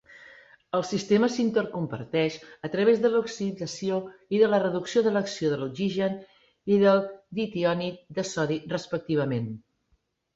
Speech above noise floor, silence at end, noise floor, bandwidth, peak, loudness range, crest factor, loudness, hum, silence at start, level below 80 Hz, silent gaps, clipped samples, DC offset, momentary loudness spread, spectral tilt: 46 dB; 0.8 s; -71 dBFS; 8 kHz; -8 dBFS; 2 LU; 18 dB; -26 LUFS; none; 0.15 s; -66 dBFS; none; under 0.1%; under 0.1%; 11 LU; -6 dB/octave